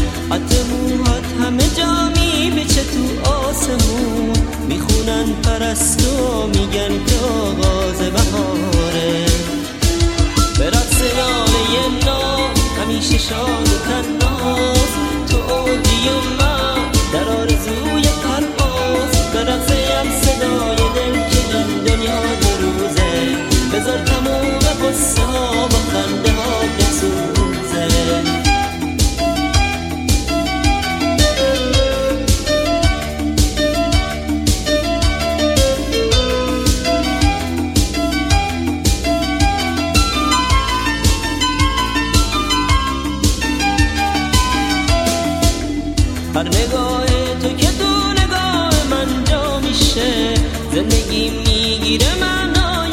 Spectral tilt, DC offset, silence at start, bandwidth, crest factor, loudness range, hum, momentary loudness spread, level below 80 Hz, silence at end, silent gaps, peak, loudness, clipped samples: -4 dB/octave; under 0.1%; 0 s; 16.5 kHz; 16 dB; 1 LU; none; 3 LU; -22 dBFS; 0 s; none; 0 dBFS; -16 LUFS; under 0.1%